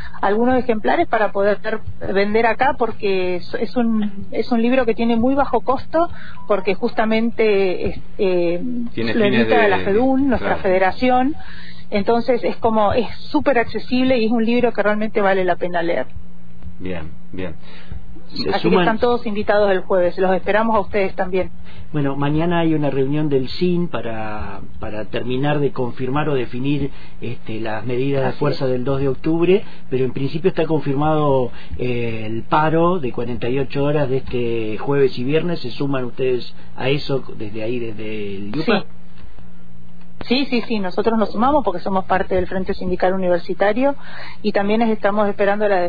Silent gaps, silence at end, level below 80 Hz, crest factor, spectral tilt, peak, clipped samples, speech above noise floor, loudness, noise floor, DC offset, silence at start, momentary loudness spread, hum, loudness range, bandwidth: none; 0 s; -42 dBFS; 16 dB; -9 dB/octave; -4 dBFS; under 0.1%; 24 dB; -19 LUFS; -43 dBFS; 9%; 0 s; 11 LU; none; 5 LU; 5 kHz